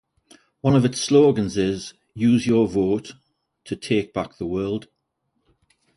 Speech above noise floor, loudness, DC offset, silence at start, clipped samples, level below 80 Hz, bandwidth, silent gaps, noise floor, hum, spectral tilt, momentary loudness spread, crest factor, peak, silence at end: 53 dB; -21 LUFS; under 0.1%; 0.65 s; under 0.1%; -52 dBFS; 11.5 kHz; none; -74 dBFS; none; -6 dB/octave; 15 LU; 18 dB; -6 dBFS; 1.15 s